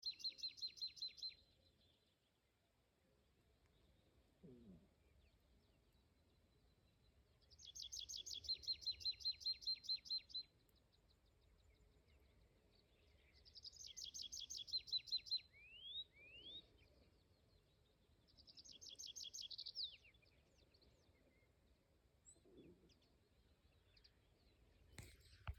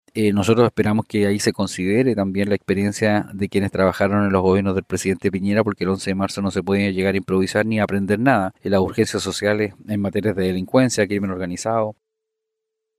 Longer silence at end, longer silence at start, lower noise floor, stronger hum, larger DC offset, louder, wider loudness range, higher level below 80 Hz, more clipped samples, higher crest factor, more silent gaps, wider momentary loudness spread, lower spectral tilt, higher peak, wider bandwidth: second, 0 s vs 1.05 s; second, 0 s vs 0.15 s; about the same, -83 dBFS vs -80 dBFS; neither; neither; second, -48 LUFS vs -20 LUFS; first, 15 LU vs 2 LU; second, -74 dBFS vs -54 dBFS; neither; about the same, 20 dB vs 16 dB; neither; first, 22 LU vs 6 LU; second, -0.5 dB/octave vs -6 dB/octave; second, -36 dBFS vs -2 dBFS; first, 17 kHz vs 15 kHz